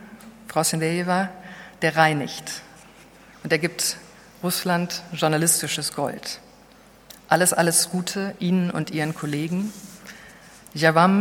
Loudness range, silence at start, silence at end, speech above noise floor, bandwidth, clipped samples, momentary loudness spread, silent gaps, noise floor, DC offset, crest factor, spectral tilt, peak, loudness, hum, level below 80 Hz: 3 LU; 0 s; 0 s; 28 dB; 19 kHz; under 0.1%; 19 LU; none; -51 dBFS; under 0.1%; 22 dB; -3.5 dB/octave; -2 dBFS; -22 LUFS; none; -62 dBFS